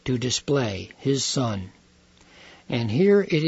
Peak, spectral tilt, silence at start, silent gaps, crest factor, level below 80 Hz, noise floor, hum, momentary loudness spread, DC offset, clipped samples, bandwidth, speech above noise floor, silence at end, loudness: -8 dBFS; -5 dB/octave; 0.05 s; none; 16 dB; -56 dBFS; -56 dBFS; none; 11 LU; under 0.1%; under 0.1%; 8 kHz; 33 dB; 0 s; -24 LUFS